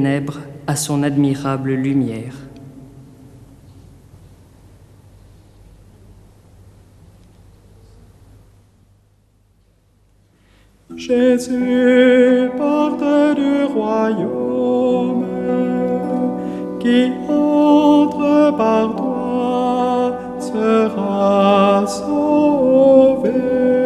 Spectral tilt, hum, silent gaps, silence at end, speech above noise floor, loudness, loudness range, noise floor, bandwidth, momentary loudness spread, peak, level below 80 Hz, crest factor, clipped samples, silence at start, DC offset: -6.5 dB/octave; none; none; 0 s; 41 dB; -16 LUFS; 8 LU; -55 dBFS; 13.5 kHz; 10 LU; 0 dBFS; -52 dBFS; 16 dB; under 0.1%; 0 s; under 0.1%